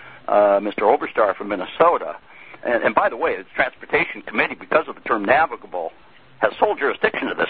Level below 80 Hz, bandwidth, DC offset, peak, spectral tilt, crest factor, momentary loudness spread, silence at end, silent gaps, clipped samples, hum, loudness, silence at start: -56 dBFS; 4.8 kHz; 0.3%; 0 dBFS; -8.5 dB/octave; 20 dB; 10 LU; 0 s; none; under 0.1%; none; -20 LUFS; 0 s